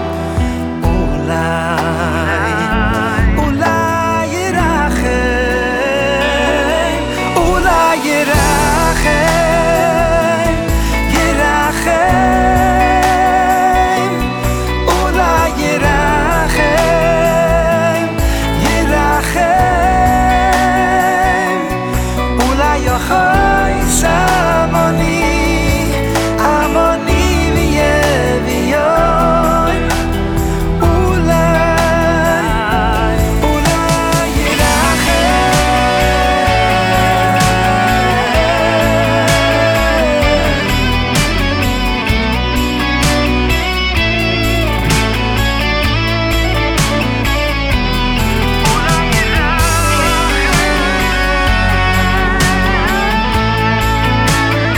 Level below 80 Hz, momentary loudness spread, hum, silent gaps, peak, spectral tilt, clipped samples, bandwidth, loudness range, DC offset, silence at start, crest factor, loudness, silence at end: -20 dBFS; 4 LU; none; none; -2 dBFS; -4.5 dB/octave; under 0.1%; over 20 kHz; 2 LU; under 0.1%; 0 s; 10 dB; -12 LUFS; 0 s